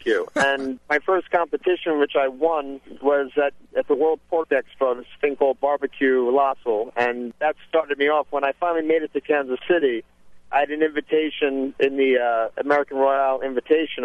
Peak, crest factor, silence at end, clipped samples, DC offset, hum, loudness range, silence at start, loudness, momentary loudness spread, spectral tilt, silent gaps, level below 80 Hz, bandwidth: -6 dBFS; 16 dB; 0 s; under 0.1%; under 0.1%; none; 1 LU; 0 s; -22 LUFS; 5 LU; -4.5 dB/octave; none; -62 dBFS; 11 kHz